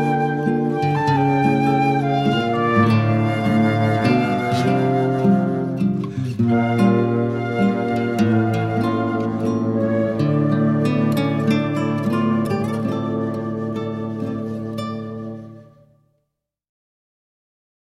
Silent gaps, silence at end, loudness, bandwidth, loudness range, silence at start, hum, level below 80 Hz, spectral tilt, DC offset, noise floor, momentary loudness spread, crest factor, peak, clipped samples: none; 2.35 s; -19 LUFS; 13 kHz; 11 LU; 0 s; none; -52 dBFS; -8 dB/octave; under 0.1%; -76 dBFS; 9 LU; 16 dB; -4 dBFS; under 0.1%